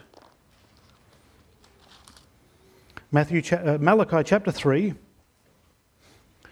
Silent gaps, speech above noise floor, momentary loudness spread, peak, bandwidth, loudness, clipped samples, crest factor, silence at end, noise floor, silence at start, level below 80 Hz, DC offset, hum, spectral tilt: none; 41 dB; 6 LU; -4 dBFS; 12.5 kHz; -23 LUFS; under 0.1%; 24 dB; 1.55 s; -63 dBFS; 3.1 s; -58 dBFS; under 0.1%; none; -7 dB/octave